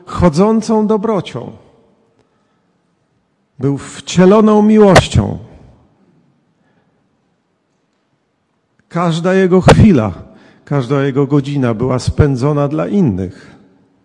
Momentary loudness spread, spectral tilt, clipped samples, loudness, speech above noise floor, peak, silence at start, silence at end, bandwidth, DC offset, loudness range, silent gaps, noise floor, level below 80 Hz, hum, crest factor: 15 LU; -7 dB/octave; 0.2%; -12 LUFS; 52 dB; 0 dBFS; 0.1 s; 0.75 s; 12 kHz; under 0.1%; 10 LU; none; -63 dBFS; -34 dBFS; none; 14 dB